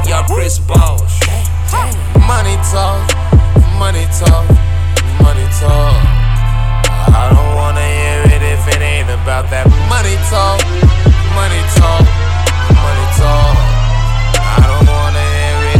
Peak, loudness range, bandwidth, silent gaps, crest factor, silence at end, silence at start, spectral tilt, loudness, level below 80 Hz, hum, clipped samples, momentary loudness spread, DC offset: 0 dBFS; 1 LU; 15 kHz; none; 8 dB; 0 s; 0 s; -5.5 dB/octave; -11 LUFS; -12 dBFS; none; under 0.1%; 5 LU; under 0.1%